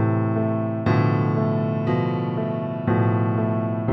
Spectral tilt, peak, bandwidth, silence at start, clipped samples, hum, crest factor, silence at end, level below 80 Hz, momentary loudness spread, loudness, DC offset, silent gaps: -10.5 dB/octave; -6 dBFS; 5.8 kHz; 0 s; under 0.1%; none; 14 dB; 0 s; -52 dBFS; 5 LU; -22 LUFS; under 0.1%; none